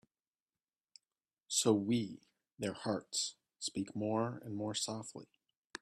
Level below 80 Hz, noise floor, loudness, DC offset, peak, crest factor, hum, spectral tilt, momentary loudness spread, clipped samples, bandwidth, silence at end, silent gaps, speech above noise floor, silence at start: -78 dBFS; under -90 dBFS; -37 LUFS; under 0.1%; -18 dBFS; 22 dB; none; -4 dB/octave; 15 LU; under 0.1%; 14 kHz; 0.05 s; 5.57-5.70 s; over 53 dB; 1.5 s